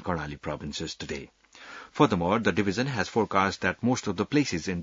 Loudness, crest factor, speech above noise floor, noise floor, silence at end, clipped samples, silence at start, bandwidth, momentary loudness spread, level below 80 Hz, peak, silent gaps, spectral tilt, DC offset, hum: -27 LUFS; 22 dB; 19 dB; -47 dBFS; 0 s; under 0.1%; 0 s; 7.8 kHz; 12 LU; -56 dBFS; -6 dBFS; none; -5 dB/octave; under 0.1%; none